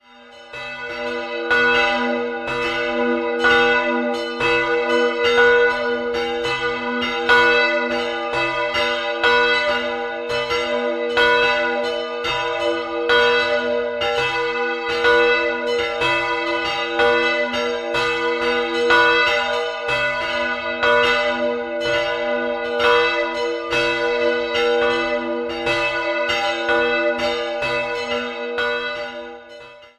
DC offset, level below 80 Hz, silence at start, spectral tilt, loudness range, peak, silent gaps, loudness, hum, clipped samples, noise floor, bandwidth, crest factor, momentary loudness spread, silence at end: under 0.1%; -50 dBFS; 0.2 s; -3 dB/octave; 3 LU; -2 dBFS; none; -19 LUFS; none; under 0.1%; -43 dBFS; 12 kHz; 18 dB; 8 LU; 0.1 s